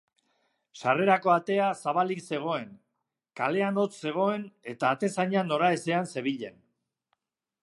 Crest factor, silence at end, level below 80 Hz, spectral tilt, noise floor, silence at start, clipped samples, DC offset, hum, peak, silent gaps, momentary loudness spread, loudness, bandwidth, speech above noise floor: 20 dB; 1.1 s; -80 dBFS; -5.5 dB/octave; -83 dBFS; 0.75 s; under 0.1%; under 0.1%; none; -8 dBFS; none; 10 LU; -28 LUFS; 11.5 kHz; 55 dB